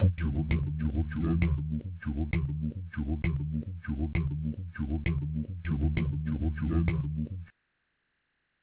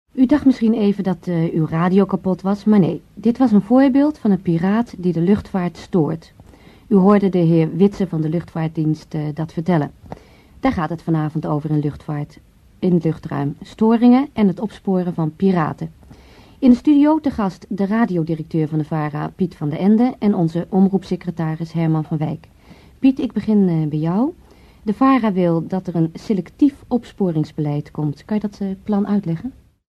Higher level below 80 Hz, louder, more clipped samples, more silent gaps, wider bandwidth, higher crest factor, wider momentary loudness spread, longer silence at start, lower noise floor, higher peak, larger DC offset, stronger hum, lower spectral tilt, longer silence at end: first, -36 dBFS vs -48 dBFS; second, -32 LUFS vs -18 LUFS; neither; neither; second, 4 kHz vs 8 kHz; about the same, 18 dB vs 18 dB; about the same, 8 LU vs 10 LU; second, 0 s vs 0.15 s; first, -78 dBFS vs -45 dBFS; second, -14 dBFS vs 0 dBFS; neither; neither; first, -11.5 dB/octave vs -9 dB/octave; first, 1.15 s vs 0.4 s